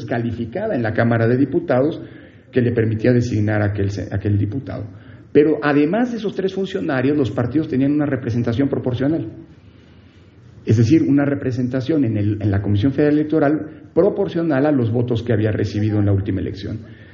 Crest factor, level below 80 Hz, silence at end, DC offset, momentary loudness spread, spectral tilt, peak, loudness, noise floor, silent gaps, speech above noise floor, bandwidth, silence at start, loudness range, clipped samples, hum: 18 dB; -50 dBFS; 0 s; under 0.1%; 8 LU; -7.5 dB/octave; 0 dBFS; -19 LUFS; -46 dBFS; none; 28 dB; 7.2 kHz; 0 s; 2 LU; under 0.1%; none